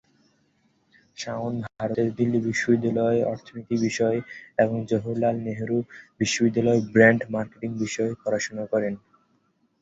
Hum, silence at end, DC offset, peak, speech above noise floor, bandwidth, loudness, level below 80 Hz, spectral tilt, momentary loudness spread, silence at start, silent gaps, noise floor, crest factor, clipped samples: none; 0.85 s; under 0.1%; -2 dBFS; 43 dB; 8 kHz; -24 LUFS; -60 dBFS; -5.5 dB/octave; 10 LU; 1.2 s; none; -67 dBFS; 22 dB; under 0.1%